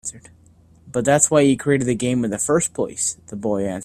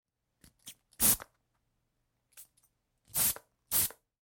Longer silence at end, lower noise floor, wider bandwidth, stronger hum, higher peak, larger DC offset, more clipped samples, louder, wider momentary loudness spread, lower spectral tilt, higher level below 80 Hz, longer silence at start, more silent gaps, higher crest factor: second, 0 s vs 0.3 s; second, -51 dBFS vs -80 dBFS; second, 15 kHz vs 17 kHz; neither; first, 0 dBFS vs -12 dBFS; neither; neither; first, -19 LUFS vs -29 LUFS; second, 10 LU vs 19 LU; first, -4.5 dB/octave vs -0.5 dB/octave; first, -54 dBFS vs -60 dBFS; second, 0.05 s vs 0.65 s; neither; about the same, 20 dB vs 24 dB